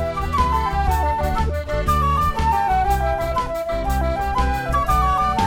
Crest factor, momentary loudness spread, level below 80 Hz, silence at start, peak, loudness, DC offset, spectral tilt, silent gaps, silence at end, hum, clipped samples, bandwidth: 14 dB; 5 LU; -26 dBFS; 0 s; -6 dBFS; -20 LUFS; under 0.1%; -6 dB/octave; none; 0 s; none; under 0.1%; 17.5 kHz